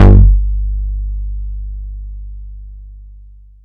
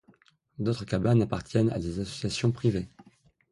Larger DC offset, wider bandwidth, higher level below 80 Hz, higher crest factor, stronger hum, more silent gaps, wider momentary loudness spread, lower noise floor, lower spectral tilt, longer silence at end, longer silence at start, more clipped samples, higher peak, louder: neither; second, 3.2 kHz vs 11.5 kHz; first, -14 dBFS vs -50 dBFS; second, 12 dB vs 18 dB; first, 50 Hz at -25 dBFS vs none; neither; first, 24 LU vs 9 LU; second, -38 dBFS vs -62 dBFS; first, -10 dB/octave vs -7 dB/octave; about the same, 0.5 s vs 0.5 s; second, 0 s vs 0.6 s; first, 2% vs under 0.1%; first, 0 dBFS vs -10 dBFS; first, -16 LUFS vs -28 LUFS